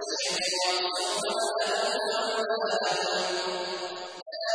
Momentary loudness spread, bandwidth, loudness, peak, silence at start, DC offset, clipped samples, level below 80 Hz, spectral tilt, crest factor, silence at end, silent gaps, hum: 8 LU; 10.5 kHz; -28 LUFS; -14 dBFS; 0 s; under 0.1%; under 0.1%; -74 dBFS; -1 dB/octave; 16 dB; 0 s; 4.22-4.26 s; none